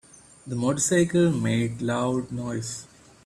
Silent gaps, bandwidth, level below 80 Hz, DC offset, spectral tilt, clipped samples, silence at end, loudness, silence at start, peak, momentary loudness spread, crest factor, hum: none; 13.5 kHz; -56 dBFS; under 0.1%; -5 dB/octave; under 0.1%; 0.4 s; -25 LUFS; 0.45 s; -10 dBFS; 13 LU; 16 dB; none